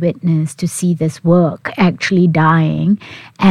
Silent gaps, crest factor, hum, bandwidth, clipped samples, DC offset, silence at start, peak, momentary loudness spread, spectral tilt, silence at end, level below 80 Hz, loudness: none; 14 dB; none; 13 kHz; under 0.1%; under 0.1%; 0 s; 0 dBFS; 6 LU; -6.5 dB/octave; 0 s; -50 dBFS; -14 LUFS